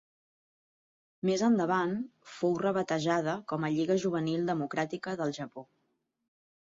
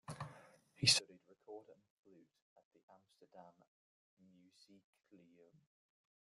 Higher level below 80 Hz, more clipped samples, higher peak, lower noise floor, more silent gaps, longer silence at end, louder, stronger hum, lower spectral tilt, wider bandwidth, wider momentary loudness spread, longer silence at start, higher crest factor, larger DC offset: first, -74 dBFS vs -80 dBFS; neither; about the same, -14 dBFS vs -14 dBFS; first, -79 dBFS vs -68 dBFS; second, none vs 1.90-2.03 s, 2.42-2.56 s, 2.65-2.71 s, 2.83-2.88 s; second, 1.05 s vs 2.95 s; first, -31 LUFS vs -34 LUFS; neither; first, -6 dB/octave vs -1.5 dB/octave; second, 7.8 kHz vs 12.5 kHz; second, 9 LU vs 25 LU; first, 1.25 s vs 0.1 s; second, 18 dB vs 32 dB; neither